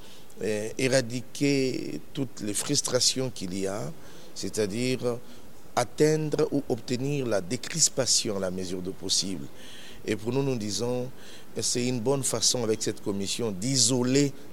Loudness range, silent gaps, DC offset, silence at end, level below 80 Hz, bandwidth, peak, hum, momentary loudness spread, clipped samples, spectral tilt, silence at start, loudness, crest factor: 4 LU; none; 1%; 0 s; -60 dBFS; 16 kHz; -8 dBFS; none; 13 LU; under 0.1%; -3.5 dB/octave; 0 s; -27 LUFS; 20 dB